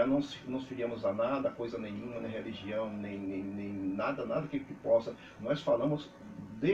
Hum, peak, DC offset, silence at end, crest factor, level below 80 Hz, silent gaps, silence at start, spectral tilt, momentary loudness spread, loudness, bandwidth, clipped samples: none; -18 dBFS; under 0.1%; 0 s; 16 dB; -66 dBFS; none; 0 s; -7.5 dB/octave; 10 LU; -35 LUFS; 7.8 kHz; under 0.1%